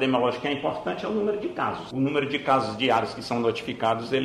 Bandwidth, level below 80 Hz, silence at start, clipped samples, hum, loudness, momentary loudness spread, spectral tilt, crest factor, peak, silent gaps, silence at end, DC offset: 12.5 kHz; -60 dBFS; 0 s; under 0.1%; none; -26 LUFS; 5 LU; -6 dB/octave; 16 dB; -8 dBFS; none; 0 s; under 0.1%